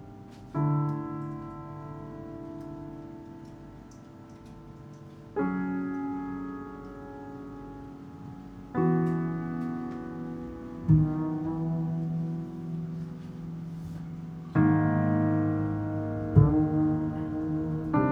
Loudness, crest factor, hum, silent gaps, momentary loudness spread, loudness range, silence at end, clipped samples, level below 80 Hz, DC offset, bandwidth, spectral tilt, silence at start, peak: -30 LUFS; 22 dB; none; none; 22 LU; 14 LU; 0 s; under 0.1%; -48 dBFS; under 0.1%; 5.2 kHz; -10.5 dB/octave; 0 s; -8 dBFS